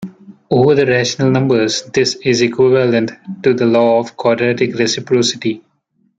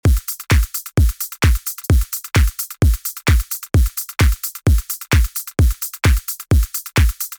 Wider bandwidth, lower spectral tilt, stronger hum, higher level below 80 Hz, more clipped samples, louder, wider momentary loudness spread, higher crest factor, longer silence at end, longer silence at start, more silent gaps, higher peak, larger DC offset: second, 9.2 kHz vs over 20 kHz; about the same, -5 dB/octave vs -5 dB/octave; neither; second, -56 dBFS vs -18 dBFS; neither; first, -14 LUFS vs -18 LUFS; first, 7 LU vs 3 LU; about the same, 12 dB vs 10 dB; first, 0.6 s vs 0.05 s; about the same, 0 s vs 0.05 s; neither; first, -2 dBFS vs -6 dBFS; neither